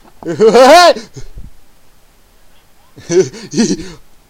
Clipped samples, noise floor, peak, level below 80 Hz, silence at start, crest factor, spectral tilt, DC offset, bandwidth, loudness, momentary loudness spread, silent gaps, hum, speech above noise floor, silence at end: 1%; -44 dBFS; 0 dBFS; -40 dBFS; 0.25 s; 12 dB; -4 dB/octave; under 0.1%; 17 kHz; -9 LUFS; 16 LU; none; none; 35 dB; 0.4 s